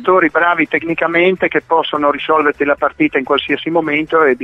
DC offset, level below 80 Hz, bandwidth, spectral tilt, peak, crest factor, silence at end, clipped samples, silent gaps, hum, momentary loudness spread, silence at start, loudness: under 0.1%; -52 dBFS; 6.2 kHz; -7 dB/octave; 0 dBFS; 14 dB; 0 s; under 0.1%; none; none; 3 LU; 0 s; -14 LUFS